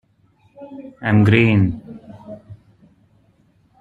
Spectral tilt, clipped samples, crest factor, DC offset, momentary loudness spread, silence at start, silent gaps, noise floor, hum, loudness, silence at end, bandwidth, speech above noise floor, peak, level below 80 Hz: -9 dB/octave; under 0.1%; 18 dB; under 0.1%; 25 LU; 0.6 s; none; -57 dBFS; none; -16 LUFS; 1.25 s; 4.5 kHz; 42 dB; -2 dBFS; -50 dBFS